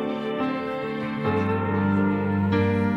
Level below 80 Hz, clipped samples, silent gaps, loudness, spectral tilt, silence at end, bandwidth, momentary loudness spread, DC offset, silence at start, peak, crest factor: -56 dBFS; under 0.1%; none; -24 LUFS; -9 dB/octave; 0 s; 6 kHz; 6 LU; under 0.1%; 0 s; -10 dBFS; 12 dB